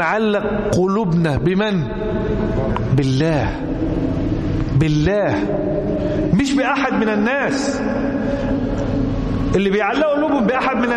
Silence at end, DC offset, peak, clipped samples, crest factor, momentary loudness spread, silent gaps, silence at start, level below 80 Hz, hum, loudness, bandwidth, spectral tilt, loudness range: 0 s; under 0.1%; -6 dBFS; under 0.1%; 12 dB; 4 LU; none; 0 s; -30 dBFS; none; -18 LUFS; 11.5 kHz; -7 dB/octave; 1 LU